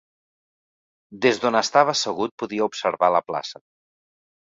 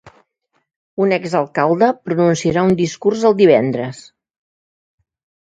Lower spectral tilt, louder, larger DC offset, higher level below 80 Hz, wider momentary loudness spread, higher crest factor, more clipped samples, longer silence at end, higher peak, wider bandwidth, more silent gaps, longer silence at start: second, -3 dB/octave vs -6.5 dB/octave; second, -22 LUFS vs -15 LUFS; neither; second, -68 dBFS vs -54 dBFS; about the same, 10 LU vs 9 LU; about the same, 22 dB vs 18 dB; neither; second, 0.9 s vs 1.5 s; about the same, -2 dBFS vs 0 dBFS; second, 7.8 kHz vs 9.2 kHz; second, 2.31-2.38 s vs 0.76-0.97 s; first, 1.1 s vs 0.05 s